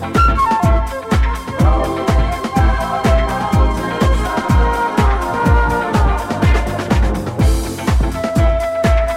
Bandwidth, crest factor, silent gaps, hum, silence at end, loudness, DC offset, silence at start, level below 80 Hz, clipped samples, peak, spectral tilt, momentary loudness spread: 15 kHz; 14 dB; none; none; 0 s; -16 LUFS; under 0.1%; 0 s; -18 dBFS; under 0.1%; 0 dBFS; -6.5 dB/octave; 4 LU